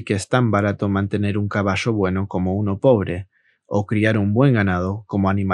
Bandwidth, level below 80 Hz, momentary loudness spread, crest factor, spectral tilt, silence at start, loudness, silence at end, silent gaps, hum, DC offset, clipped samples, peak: 11 kHz; -58 dBFS; 7 LU; 18 dB; -7.5 dB/octave; 0 s; -20 LUFS; 0 s; none; none; under 0.1%; under 0.1%; -2 dBFS